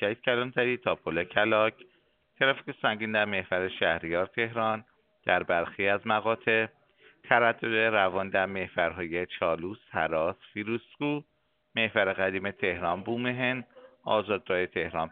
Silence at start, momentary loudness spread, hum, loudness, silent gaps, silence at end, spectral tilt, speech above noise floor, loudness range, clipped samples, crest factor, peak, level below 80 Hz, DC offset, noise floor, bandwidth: 0 s; 8 LU; none; -28 LUFS; none; 0 s; -2.5 dB/octave; 39 dB; 4 LU; under 0.1%; 24 dB; -6 dBFS; -64 dBFS; under 0.1%; -67 dBFS; 4.6 kHz